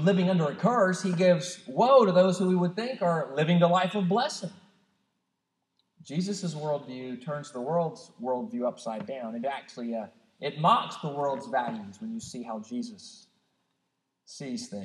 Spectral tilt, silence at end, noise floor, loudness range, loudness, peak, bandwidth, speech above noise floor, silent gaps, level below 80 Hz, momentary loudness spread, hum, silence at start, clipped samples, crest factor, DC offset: -6 dB/octave; 0 s; -81 dBFS; 11 LU; -28 LUFS; -8 dBFS; 11 kHz; 53 dB; none; -80 dBFS; 15 LU; none; 0 s; under 0.1%; 20 dB; under 0.1%